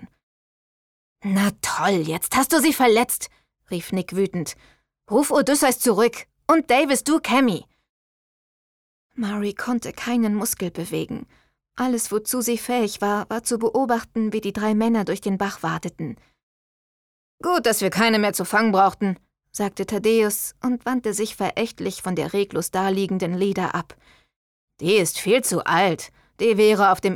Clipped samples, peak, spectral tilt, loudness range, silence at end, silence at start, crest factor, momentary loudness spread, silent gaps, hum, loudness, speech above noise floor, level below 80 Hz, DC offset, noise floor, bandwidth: under 0.1%; -6 dBFS; -4 dB/octave; 5 LU; 0 s; 0 s; 18 dB; 12 LU; 0.23-1.16 s, 7.89-9.10 s, 16.43-17.38 s, 24.36-24.68 s; none; -21 LUFS; over 69 dB; -58 dBFS; under 0.1%; under -90 dBFS; 19 kHz